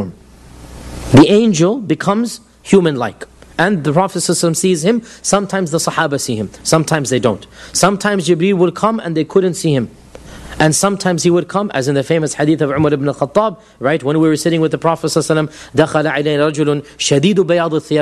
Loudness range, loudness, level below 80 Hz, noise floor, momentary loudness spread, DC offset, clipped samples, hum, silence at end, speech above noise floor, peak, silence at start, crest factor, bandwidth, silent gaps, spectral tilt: 2 LU; -14 LUFS; -44 dBFS; -39 dBFS; 8 LU; under 0.1%; 0.1%; none; 0 s; 25 dB; 0 dBFS; 0 s; 14 dB; 13 kHz; none; -5 dB/octave